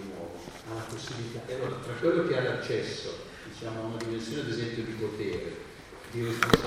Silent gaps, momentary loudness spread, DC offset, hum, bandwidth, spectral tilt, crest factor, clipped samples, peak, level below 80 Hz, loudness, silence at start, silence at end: none; 14 LU; under 0.1%; none; 16.5 kHz; -5 dB/octave; 32 dB; under 0.1%; 0 dBFS; -54 dBFS; -33 LUFS; 0 s; 0 s